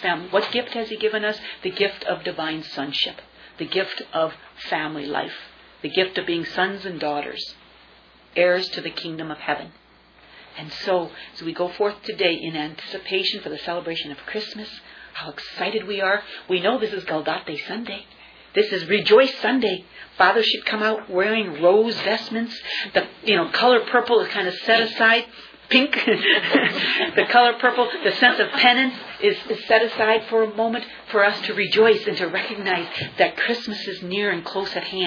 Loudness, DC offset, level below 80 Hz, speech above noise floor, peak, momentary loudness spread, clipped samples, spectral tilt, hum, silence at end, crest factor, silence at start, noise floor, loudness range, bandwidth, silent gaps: -21 LUFS; under 0.1%; -64 dBFS; 30 dB; -2 dBFS; 14 LU; under 0.1%; -5 dB/octave; none; 0 s; 20 dB; 0 s; -52 dBFS; 9 LU; 5.4 kHz; none